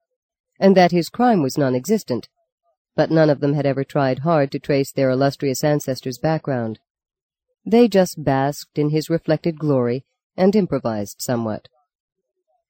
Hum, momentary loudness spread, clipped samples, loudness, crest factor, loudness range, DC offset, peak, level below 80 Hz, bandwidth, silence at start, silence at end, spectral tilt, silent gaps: none; 10 LU; under 0.1%; -19 LUFS; 18 dB; 3 LU; under 0.1%; -2 dBFS; -58 dBFS; 17 kHz; 0.6 s; 1.1 s; -6.5 dB/octave; 2.52-2.58 s, 2.77-2.85 s, 6.90-6.95 s, 7.23-7.29 s, 10.24-10.30 s